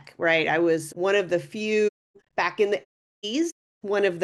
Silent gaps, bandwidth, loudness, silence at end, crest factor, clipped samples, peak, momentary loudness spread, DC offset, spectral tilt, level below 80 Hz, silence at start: 1.89-2.14 s, 2.85-3.22 s, 3.52-3.81 s; 12.5 kHz; -25 LUFS; 0 s; 16 dB; under 0.1%; -8 dBFS; 9 LU; under 0.1%; -4.5 dB/octave; -74 dBFS; 0.05 s